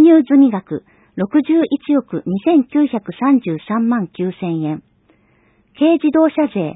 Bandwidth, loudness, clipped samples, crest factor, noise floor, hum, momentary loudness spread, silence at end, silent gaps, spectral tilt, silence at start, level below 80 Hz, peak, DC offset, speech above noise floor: 4 kHz; -16 LUFS; under 0.1%; 14 dB; -56 dBFS; none; 12 LU; 0.05 s; none; -12.5 dB/octave; 0 s; -60 dBFS; 0 dBFS; under 0.1%; 40 dB